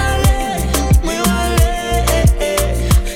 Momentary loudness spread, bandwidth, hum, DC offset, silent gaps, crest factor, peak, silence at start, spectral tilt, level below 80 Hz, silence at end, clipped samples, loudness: 3 LU; 17.5 kHz; none; under 0.1%; none; 10 dB; -2 dBFS; 0 s; -5 dB/octave; -16 dBFS; 0 s; under 0.1%; -15 LUFS